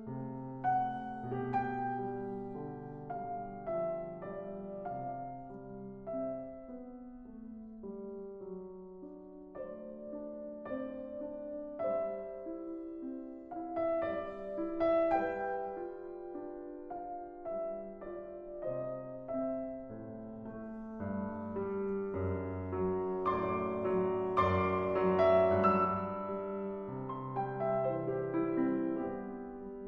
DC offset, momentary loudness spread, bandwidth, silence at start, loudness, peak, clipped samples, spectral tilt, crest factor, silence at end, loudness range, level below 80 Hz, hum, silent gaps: under 0.1%; 15 LU; 5.8 kHz; 0 s; -37 LUFS; -16 dBFS; under 0.1%; -9.5 dB/octave; 20 dB; 0 s; 14 LU; -62 dBFS; none; none